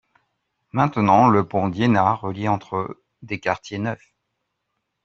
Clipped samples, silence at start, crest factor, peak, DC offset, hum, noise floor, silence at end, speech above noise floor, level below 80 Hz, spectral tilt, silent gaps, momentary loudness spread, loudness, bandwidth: under 0.1%; 0.75 s; 18 dB; -4 dBFS; under 0.1%; none; -77 dBFS; 1.1 s; 57 dB; -58 dBFS; -7.5 dB/octave; none; 14 LU; -21 LUFS; 7.4 kHz